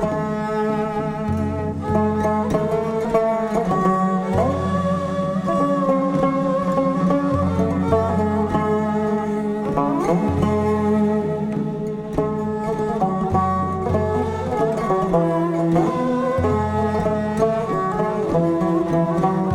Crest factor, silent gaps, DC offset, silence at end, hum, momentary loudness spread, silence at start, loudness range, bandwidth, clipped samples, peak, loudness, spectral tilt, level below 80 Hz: 16 dB; none; under 0.1%; 0 s; none; 4 LU; 0 s; 2 LU; 12 kHz; under 0.1%; -4 dBFS; -20 LUFS; -8.5 dB/octave; -42 dBFS